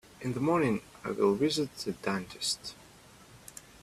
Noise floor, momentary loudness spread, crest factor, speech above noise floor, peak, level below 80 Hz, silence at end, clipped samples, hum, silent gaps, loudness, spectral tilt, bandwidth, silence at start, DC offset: -55 dBFS; 21 LU; 20 dB; 25 dB; -14 dBFS; -64 dBFS; 0.05 s; under 0.1%; none; none; -31 LUFS; -4.5 dB/octave; 15 kHz; 0.2 s; under 0.1%